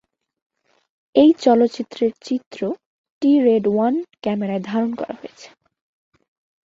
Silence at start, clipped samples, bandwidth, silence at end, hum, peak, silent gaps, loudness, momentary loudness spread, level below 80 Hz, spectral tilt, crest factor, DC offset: 1.15 s; under 0.1%; 7.6 kHz; 1.2 s; none; -2 dBFS; 2.46-2.51 s, 2.86-3.04 s, 3.10-3.21 s; -19 LUFS; 14 LU; -64 dBFS; -7 dB/octave; 18 dB; under 0.1%